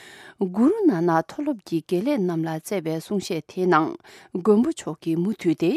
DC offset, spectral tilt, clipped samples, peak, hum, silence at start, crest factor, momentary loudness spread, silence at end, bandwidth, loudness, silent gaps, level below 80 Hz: under 0.1%; -6.5 dB/octave; under 0.1%; -4 dBFS; none; 0 s; 18 dB; 10 LU; 0 s; 14.5 kHz; -23 LUFS; none; -68 dBFS